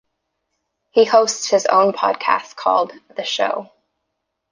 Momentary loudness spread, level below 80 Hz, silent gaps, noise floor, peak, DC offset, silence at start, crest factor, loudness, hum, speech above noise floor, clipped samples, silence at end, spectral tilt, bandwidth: 10 LU; -72 dBFS; none; -76 dBFS; -2 dBFS; under 0.1%; 0.95 s; 18 dB; -18 LUFS; none; 59 dB; under 0.1%; 0.85 s; -2 dB/octave; 10 kHz